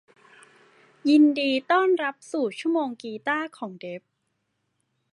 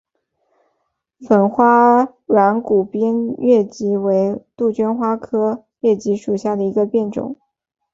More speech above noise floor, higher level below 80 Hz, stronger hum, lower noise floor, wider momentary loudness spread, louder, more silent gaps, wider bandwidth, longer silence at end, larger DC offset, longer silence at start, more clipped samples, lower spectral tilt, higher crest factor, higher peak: about the same, 53 dB vs 55 dB; second, -86 dBFS vs -60 dBFS; neither; first, -76 dBFS vs -71 dBFS; first, 18 LU vs 8 LU; second, -24 LUFS vs -17 LUFS; neither; first, 11 kHz vs 7.8 kHz; first, 1.15 s vs 0.6 s; neither; second, 1.05 s vs 1.2 s; neither; second, -4.5 dB/octave vs -8 dB/octave; about the same, 18 dB vs 16 dB; second, -8 dBFS vs -2 dBFS